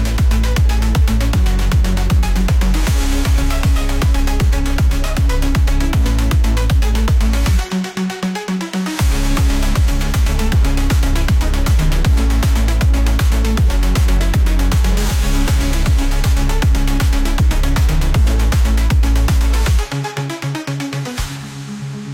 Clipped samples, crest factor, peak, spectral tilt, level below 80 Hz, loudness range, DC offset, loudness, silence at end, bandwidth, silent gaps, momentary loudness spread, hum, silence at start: under 0.1%; 8 dB; -4 dBFS; -5.5 dB/octave; -14 dBFS; 2 LU; under 0.1%; -16 LUFS; 0 s; 16.5 kHz; none; 6 LU; none; 0 s